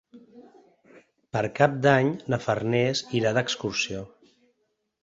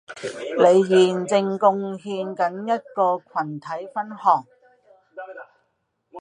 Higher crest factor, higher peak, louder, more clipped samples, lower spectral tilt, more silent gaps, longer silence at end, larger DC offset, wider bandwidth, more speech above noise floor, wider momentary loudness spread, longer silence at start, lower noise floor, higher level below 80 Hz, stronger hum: about the same, 22 dB vs 20 dB; about the same, -4 dBFS vs -2 dBFS; second, -25 LUFS vs -21 LUFS; neither; about the same, -5 dB/octave vs -5.5 dB/octave; neither; first, 0.95 s vs 0 s; neither; second, 8 kHz vs 10 kHz; about the same, 51 dB vs 51 dB; second, 10 LU vs 18 LU; about the same, 0.15 s vs 0.1 s; about the same, -75 dBFS vs -72 dBFS; first, -60 dBFS vs -76 dBFS; neither